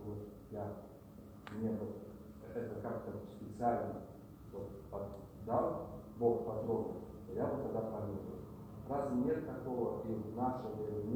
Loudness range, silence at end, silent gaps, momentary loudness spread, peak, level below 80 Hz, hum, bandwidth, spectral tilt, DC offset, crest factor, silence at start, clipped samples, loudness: 4 LU; 0 s; none; 14 LU; -22 dBFS; -62 dBFS; none; over 20 kHz; -9 dB/octave; under 0.1%; 20 dB; 0 s; under 0.1%; -41 LUFS